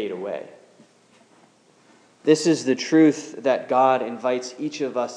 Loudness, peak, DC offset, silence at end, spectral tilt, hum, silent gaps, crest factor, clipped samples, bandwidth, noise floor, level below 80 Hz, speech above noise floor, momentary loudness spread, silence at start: -21 LUFS; -4 dBFS; under 0.1%; 0 s; -5 dB/octave; none; none; 18 dB; under 0.1%; 10.5 kHz; -56 dBFS; -86 dBFS; 35 dB; 13 LU; 0 s